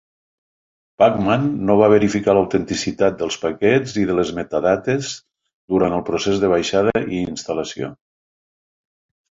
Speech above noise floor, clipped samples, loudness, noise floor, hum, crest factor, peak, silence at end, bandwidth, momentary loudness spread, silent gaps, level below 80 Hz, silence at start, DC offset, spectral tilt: over 72 dB; under 0.1%; -18 LUFS; under -90 dBFS; none; 18 dB; -2 dBFS; 1.4 s; 7.8 kHz; 9 LU; 5.53-5.68 s; -48 dBFS; 1 s; under 0.1%; -5.5 dB/octave